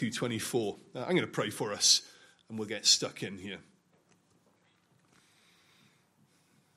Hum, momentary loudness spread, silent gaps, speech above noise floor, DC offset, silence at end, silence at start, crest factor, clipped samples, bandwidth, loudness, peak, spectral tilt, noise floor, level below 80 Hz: none; 18 LU; none; 38 dB; under 0.1%; 3.15 s; 0 s; 24 dB; under 0.1%; 15.5 kHz; -29 LUFS; -10 dBFS; -2 dB/octave; -69 dBFS; -80 dBFS